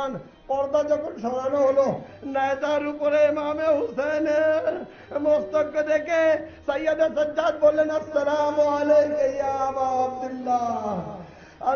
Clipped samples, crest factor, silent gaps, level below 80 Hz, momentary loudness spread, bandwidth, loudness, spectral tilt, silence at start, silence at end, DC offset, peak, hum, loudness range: under 0.1%; 14 dB; none; -58 dBFS; 9 LU; 6.8 kHz; -23 LUFS; -5.5 dB/octave; 0 s; 0 s; under 0.1%; -8 dBFS; none; 2 LU